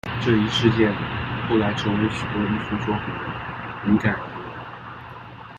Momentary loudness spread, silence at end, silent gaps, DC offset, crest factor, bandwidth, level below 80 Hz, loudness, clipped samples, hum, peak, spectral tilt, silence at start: 17 LU; 0 s; none; under 0.1%; 20 dB; 9.2 kHz; -46 dBFS; -23 LUFS; under 0.1%; none; -4 dBFS; -6.5 dB/octave; 0.05 s